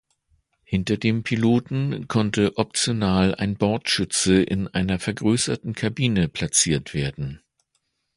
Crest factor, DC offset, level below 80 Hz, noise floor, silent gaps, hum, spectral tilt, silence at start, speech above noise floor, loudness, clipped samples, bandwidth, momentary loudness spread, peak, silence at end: 20 dB; under 0.1%; -44 dBFS; -73 dBFS; none; none; -4.5 dB/octave; 0.7 s; 51 dB; -22 LUFS; under 0.1%; 11.5 kHz; 8 LU; -4 dBFS; 0.8 s